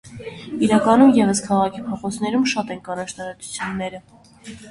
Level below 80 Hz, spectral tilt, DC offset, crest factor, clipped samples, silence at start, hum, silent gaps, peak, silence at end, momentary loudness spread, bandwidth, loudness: -54 dBFS; -5 dB/octave; under 0.1%; 18 dB; under 0.1%; 0.05 s; none; none; -2 dBFS; 0 s; 22 LU; 11.5 kHz; -19 LUFS